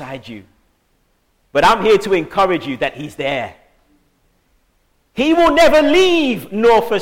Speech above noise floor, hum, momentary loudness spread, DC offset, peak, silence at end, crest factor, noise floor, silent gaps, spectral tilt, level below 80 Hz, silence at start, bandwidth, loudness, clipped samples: 47 dB; none; 17 LU; under 0.1%; -4 dBFS; 0 s; 14 dB; -61 dBFS; none; -4.5 dB/octave; -42 dBFS; 0 s; 17 kHz; -14 LUFS; under 0.1%